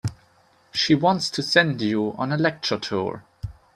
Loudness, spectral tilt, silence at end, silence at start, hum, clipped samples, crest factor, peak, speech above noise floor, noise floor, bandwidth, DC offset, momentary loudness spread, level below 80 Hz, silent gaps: -22 LUFS; -5 dB/octave; 0.25 s; 0.05 s; none; under 0.1%; 22 dB; -2 dBFS; 36 dB; -59 dBFS; 13.5 kHz; under 0.1%; 14 LU; -52 dBFS; none